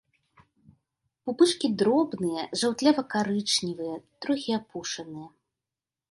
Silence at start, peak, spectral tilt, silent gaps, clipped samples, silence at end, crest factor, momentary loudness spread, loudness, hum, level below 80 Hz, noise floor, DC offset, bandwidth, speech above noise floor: 1.25 s; -8 dBFS; -4 dB/octave; none; under 0.1%; 0.85 s; 20 dB; 13 LU; -27 LUFS; none; -70 dBFS; under -90 dBFS; under 0.1%; 11.5 kHz; over 63 dB